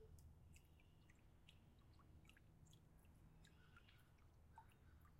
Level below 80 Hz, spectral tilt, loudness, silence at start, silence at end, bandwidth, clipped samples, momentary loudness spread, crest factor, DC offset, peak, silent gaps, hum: -74 dBFS; -5 dB/octave; -69 LUFS; 0 s; 0 s; 16 kHz; under 0.1%; 2 LU; 18 dB; under 0.1%; -50 dBFS; none; none